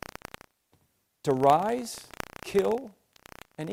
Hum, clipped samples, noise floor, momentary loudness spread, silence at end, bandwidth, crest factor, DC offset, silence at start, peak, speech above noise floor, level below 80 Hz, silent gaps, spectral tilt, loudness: none; under 0.1%; -70 dBFS; 23 LU; 0 s; 16.5 kHz; 22 dB; under 0.1%; 1.25 s; -8 dBFS; 44 dB; -62 dBFS; none; -5.5 dB/octave; -27 LUFS